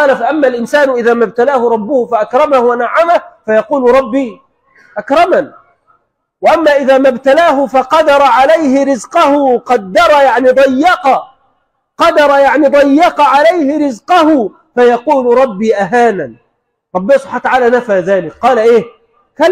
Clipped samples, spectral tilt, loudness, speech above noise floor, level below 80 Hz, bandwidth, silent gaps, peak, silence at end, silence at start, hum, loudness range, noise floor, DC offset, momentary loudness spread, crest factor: under 0.1%; -5 dB/octave; -9 LUFS; 54 dB; -48 dBFS; 14 kHz; none; 0 dBFS; 0 s; 0 s; none; 4 LU; -62 dBFS; under 0.1%; 7 LU; 10 dB